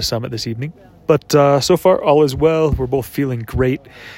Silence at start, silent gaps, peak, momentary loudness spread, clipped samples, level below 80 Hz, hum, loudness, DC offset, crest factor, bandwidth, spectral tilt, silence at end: 0 s; none; 0 dBFS; 12 LU; under 0.1%; -36 dBFS; none; -16 LUFS; under 0.1%; 16 dB; 16.5 kHz; -6 dB/octave; 0 s